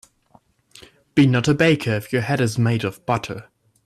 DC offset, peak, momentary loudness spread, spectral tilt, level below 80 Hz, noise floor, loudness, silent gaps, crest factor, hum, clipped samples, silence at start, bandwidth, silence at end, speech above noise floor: under 0.1%; -6 dBFS; 8 LU; -6.5 dB/octave; -54 dBFS; -57 dBFS; -20 LUFS; none; 16 dB; none; under 0.1%; 1.15 s; 14 kHz; 0.45 s; 38 dB